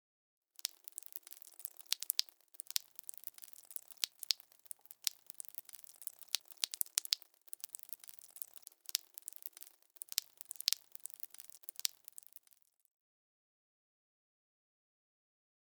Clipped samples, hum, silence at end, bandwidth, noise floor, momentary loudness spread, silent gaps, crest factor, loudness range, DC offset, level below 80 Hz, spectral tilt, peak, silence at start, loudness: under 0.1%; none; 3.8 s; over 20 kHz; -72 dBFS; 16 LU; none; 40 dB; 7 LU; under 0.1%; under -90 dBFS; 5.5 dB/octave; -6 dBFS; 0.65 s; -41 LUFS